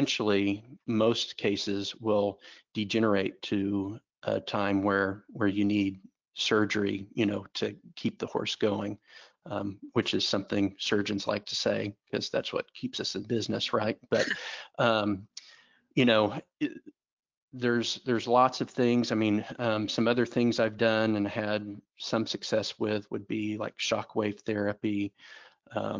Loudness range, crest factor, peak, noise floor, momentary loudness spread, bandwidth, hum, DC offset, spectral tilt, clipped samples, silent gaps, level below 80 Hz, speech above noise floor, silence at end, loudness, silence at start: 4 LU; 20 dB; -10 dBFS; -59 dBFS; 10 LU; 7.6 kHz; none; under 0.1%; -5 dB/octave; under 0.1%; 17.12-17.23 s, 17.37-17.48 s; -64 dBFS; 30 dB; 0 s; -30 LUFS; 0 s